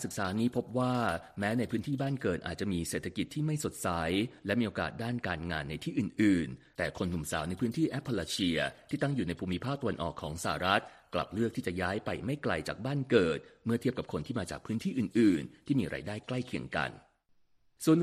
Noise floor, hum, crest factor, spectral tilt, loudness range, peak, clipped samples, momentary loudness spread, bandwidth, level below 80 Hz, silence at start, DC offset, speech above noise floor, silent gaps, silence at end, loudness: -68 dBFS; none; 22 dB; -5.5 dB/octave; 2 LU; -10 dBFS; under 0.1%; 9 LU; 14.5 kHz; -58 dBFS; 0 s; under 0.1%; 35 dB; none; 0 s; -33 LUFS